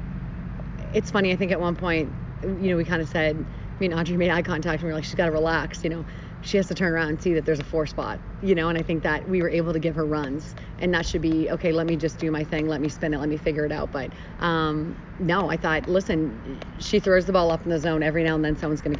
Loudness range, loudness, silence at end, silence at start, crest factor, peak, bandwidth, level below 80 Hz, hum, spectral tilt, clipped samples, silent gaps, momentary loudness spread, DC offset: 2 LU; -25 LUFS; 0 s; 0 s; 18 dB; -6 dBFS; 7.6 kHz; -40 dBFS; none; -6.5 dB/octave; under 0.1%; none; 10 LU; under 0.1%